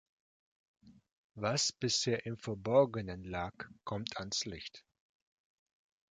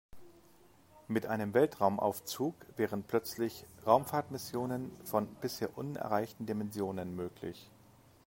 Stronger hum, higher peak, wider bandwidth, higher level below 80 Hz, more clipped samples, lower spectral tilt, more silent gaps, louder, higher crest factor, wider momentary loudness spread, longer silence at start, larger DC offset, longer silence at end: neither; about the same, -14 dBFS vs -12 dBFS; second, 9.6 kHz vs 16.5 kHz; first, -64 dBFS vs -70 dBFS; neither; second, -3.5 dB/octave vs -5.5 dB/octave; first, 1.12-1.30 s vs none; about the same, -35 LUFS vs -35 LUFS; about the same, 24 dB vs 24 dB; about the same, 13 LU vs 11 LU; first, 0.85 s vs 0.15 s; neither; first, 1.3 s vs 0.6 s